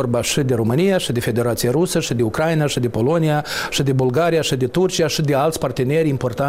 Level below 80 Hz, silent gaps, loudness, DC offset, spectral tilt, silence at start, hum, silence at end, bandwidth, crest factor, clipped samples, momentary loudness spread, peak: -44 dBFS; none; -18 LUFS; 0.2%; -5.5 dB/octave; 0 s; none; 0 s; 16 kHz; 10 dB; under 0.1%; 3 LU; -8 dBFS